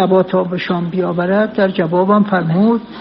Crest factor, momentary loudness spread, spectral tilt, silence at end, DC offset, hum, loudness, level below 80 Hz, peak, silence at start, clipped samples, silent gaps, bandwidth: 12 dB; 5 LU; -6 dB/octave; 0 s; under 0.1%; none; -15 LUFS; -54 dBFS; -2 dBFS; 0 s; under 0.1%; none; 5.6 kHz